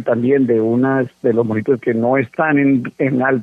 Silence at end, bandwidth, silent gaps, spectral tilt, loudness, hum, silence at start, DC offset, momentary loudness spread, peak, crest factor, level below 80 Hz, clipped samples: 0 s; 3.9 kHz; none; -10 dB/octave; -16 LUFS; none; 0 s; under 0.1%; 3 LU; -2 dBFS; 14 dB; -62 dBFS; under 0.1%